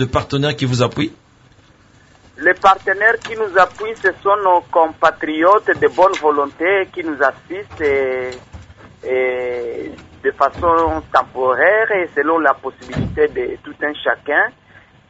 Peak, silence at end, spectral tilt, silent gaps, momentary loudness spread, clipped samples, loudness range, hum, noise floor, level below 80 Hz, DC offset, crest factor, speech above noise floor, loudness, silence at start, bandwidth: 0 dBFS; 0.6 s; -5.5 dB/octave; none; 11 LU; under 0.1%; 5 LU; none; -49 dBFS; -42 dBFS; under 0.1%; 16 dB; 33 dB; -16 LUFS; 0 s; 8 kHz